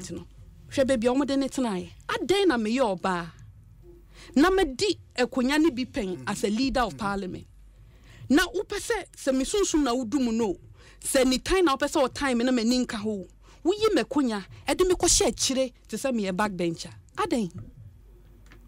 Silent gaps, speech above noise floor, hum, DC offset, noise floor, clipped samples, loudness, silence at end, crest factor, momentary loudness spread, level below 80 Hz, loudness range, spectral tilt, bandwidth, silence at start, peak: none; 25 dB; none; under 0.1%; -51 dBFS; under 0.1%; -26 LUFS; 0 s; 16 dB; 10 LU; -46 dBFS; 3 LU; -3.5 dB/octave; 16 kHz; 0 s; -10 dBFS